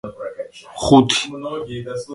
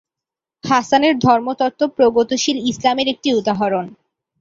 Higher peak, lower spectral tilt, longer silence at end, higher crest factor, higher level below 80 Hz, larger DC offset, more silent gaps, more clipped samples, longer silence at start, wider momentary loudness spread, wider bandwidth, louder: about the same, 0 dBFS vs -2 dBFS; about the same, -4.5 dB/octave vs -4.5 dB/octave; second, 0 s vs 0.5 s; about the same, 20 dB vs 16 dB; first, -46 dBFS vs -56 dBFS; neither; neither; neither; second, 0.05 s vs 0.65 s; first, 19 LU vs 7 LU; first, 11.5 kHz vs 7.8 kHz; about the same, -18 LUFS vs -17 LUFS